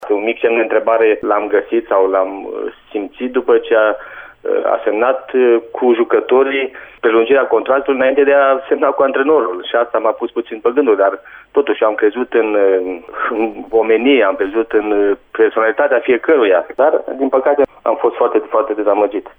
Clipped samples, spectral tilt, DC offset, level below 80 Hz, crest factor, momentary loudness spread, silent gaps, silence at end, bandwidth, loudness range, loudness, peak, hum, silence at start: under 0.1%; -7 dB/octave; under 0.1%; -54 dBFS; 12 dB; 8 LU; none; 0.1 s; 3.7 kHz; 2 LU; -14 LUFS; -2 dBFS; none; 0 s